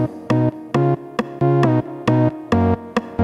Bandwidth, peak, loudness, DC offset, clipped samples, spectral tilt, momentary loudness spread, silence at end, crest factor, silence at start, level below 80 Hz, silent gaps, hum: 9.4 kHz; -4 dBFS; -19 LUFS; under 0.1%; under 0.1%; -8.5 dB/octave; 6 LU; 0 s; 16 dB; 0 s; -46 dBFS; none; none